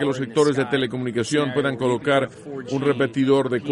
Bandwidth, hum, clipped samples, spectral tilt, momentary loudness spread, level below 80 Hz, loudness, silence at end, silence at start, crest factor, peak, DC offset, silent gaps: 11.5 kHz; none; under 0.1%; -5.5 dB/octave; 6 LU; -60 dBFS; -22 LUFS; 0 s; 0 s; 16 dB; -6 dBFS; under 0.1%; none